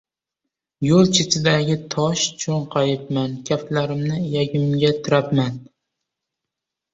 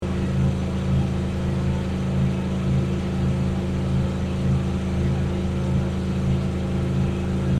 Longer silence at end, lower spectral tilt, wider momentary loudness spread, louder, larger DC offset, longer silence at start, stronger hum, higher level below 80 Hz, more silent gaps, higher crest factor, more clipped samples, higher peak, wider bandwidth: first, 1.3 s vs 0 s; second, -5 dB/octave vs -8 dB/octave; first, 8 LU vs 2 LU; first, -20 LUFS vs -24 LUFS; neither; first, 0.8 s vs 0 s; neither; second, -54 dBFS vs -34 dBFS; neither; first, 18 dB vs 12 dB; neither; first, -2 dBFS vs -12 dBFS; second, 8.2 kHz vs 10 kHz